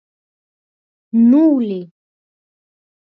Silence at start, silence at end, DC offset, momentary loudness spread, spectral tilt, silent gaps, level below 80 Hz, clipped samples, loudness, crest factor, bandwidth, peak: 1.15 s; 1.2 s; under 0.1%; 13 LU; -10.5 dB/octave; none; -70 dBFS; under 0.1%; -14 LUFS; 14 dB; 3.9 kHz; -4 dBFS